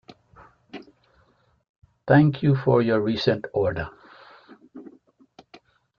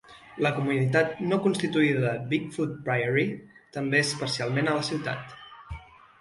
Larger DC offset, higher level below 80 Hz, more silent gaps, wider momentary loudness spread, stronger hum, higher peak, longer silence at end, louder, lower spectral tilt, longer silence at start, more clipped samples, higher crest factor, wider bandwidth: neither; about the same, -56 dBFS vs -56 dBFS; first, 1.69-1.82 s vs none; first, 26 LU vs 18 LU; neither; first, -4 dBFS vs -8 dBFS; first, 1.1 s vs 0.35 s; first, -21 LUFS vs -26 LUFS; first, -8.5 dB/octave vs -5.5 dB/octave; first, 0.75 s vs 0.1 s; neither; about the same, 20 dB vs 20 dB; second, 6.6 kHz vs 11.5 kHz